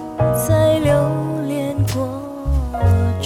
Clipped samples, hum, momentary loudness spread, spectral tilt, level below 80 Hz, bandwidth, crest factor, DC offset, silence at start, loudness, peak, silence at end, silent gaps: under 0.1%; none; 8 LU; -6.5 dB/octave; -28 dBFS; 17.5 kHz; 14 dB; under 0.1%; 0 s; -18 LUFS; -4 dBFS; 0 s; none